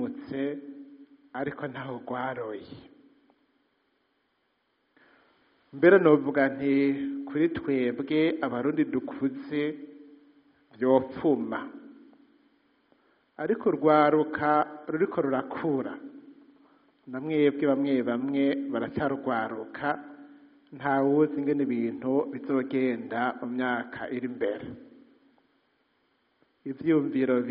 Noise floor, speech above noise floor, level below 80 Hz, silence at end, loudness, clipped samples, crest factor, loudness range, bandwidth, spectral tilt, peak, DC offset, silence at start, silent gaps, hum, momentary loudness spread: -74 dBFS; 47 dB; -70 dBFS; 0 s; -27 LUFS; under 0.1%; 22 dB; 11 LU; 5.2 kHz; -5.5 dB/octave; -6 dBFS; under 0.1%; 0 s; none; none; 15 LU